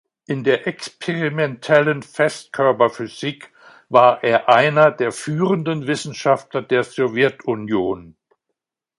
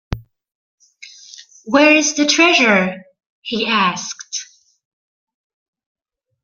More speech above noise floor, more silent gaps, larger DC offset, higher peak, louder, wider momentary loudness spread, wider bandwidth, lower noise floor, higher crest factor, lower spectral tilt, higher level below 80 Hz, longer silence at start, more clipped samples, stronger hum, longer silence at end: first, 61 dB vs 28 dB; second, none vs 0.55-0.78 s, 3.26-3.42 s; neither; about the same, 0 dBFS vs 0 dBFS; second, -19 LUFS vs -14 LUFS; second, 12 LU vs 22 LU; first, 11.5 kHz vs 7.6 kHz; first, -79 dBFS vs -42 dBFS; about the same, 18 dB vs 18 dB; first, -5.5 dB/octave vs -2.5 dB/octave; second, -62 dBFS vs -44 dBFS; first, 0.3 s vs 0.1 s; neither; neither; second, 0.9 s vs 2 s